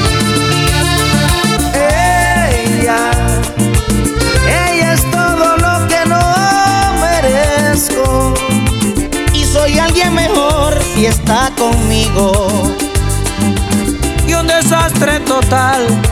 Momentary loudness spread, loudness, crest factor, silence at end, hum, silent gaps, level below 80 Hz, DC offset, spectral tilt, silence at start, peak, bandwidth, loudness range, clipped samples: 4 LU; -11 LUFS; 10 dB; 0 s; none; none; -20 dBFS; under 0.1%; -4.5 dB/octave; 0 s; 0 dBFS; 17.5 kHz; 2 LU; under 0.1%